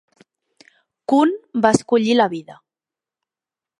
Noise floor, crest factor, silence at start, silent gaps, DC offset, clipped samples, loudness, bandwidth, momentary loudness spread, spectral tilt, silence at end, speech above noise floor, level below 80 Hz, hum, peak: -90 dBFS; 20 dB; 1.1 s; none; under 0.1%; under 0.1%; -18 LUFS; 11.5 kHz; 10 LU; -5 dB/octave; 1.25 s; 72 dB; -60 dBFS; none; 0 dBFS